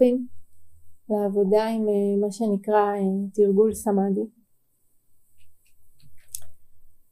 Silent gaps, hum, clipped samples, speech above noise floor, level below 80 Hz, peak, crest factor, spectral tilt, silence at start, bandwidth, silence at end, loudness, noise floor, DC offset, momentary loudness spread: none; none; under 0.1%; 42 dB; -60 dBFS; -6 dBFS; 18 dB; -7 dB/octave; 0 s; 15 kHz; 0.15 s; -23 LUFS; -64 dBFS; under 0.1%; 18 LU